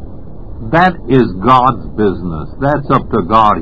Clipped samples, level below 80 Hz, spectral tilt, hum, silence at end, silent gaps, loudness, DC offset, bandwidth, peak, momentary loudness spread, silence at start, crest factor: 0.6%; -30 dBFS; -8.5 dB/octave; none; 0 s; none; -12 LUFS; 4%; 8 kHz; 0 dBFS; 18 LU; 0 s; 12 dB